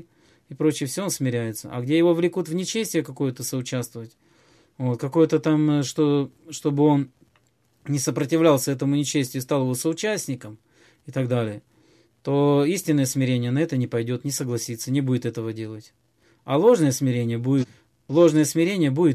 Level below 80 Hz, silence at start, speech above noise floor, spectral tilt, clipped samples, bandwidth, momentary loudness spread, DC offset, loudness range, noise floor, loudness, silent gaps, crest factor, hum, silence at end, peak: -68 dBFS; 0.5 s; 42 dB; -6 dB/octave; under 0.1%; 15 kHz; 13 LU; under 0.1%; 3 LU; -64 dBFS; -23 LUFS; none; 18 dB; none; 0 s; -6 dBFS